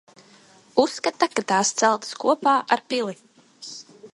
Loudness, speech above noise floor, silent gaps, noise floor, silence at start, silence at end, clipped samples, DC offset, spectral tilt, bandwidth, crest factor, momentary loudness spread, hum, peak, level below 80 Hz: -22 LUFS; 31 dB; none; -53 dBFS; 0.75 s; 0.05 s; under 0.1%; under 0.1%; -2.5 dB/octave; 11.5 kHz; 20 dB; 18 LU; none; -4 dBFS; -70 dBFS